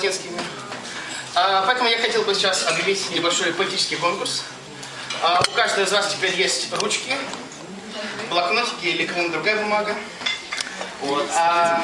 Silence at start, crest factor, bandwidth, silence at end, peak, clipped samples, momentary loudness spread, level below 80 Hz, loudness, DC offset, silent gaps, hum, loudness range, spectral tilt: 0 s; 20 dB; 11.5 kHz; 0 s; -2 dBFS; under 0.1%; 13 LU; -64 dBFS; -21 LUFS; under 0.1%; none; none; 3 LU; -1.5 dB/octave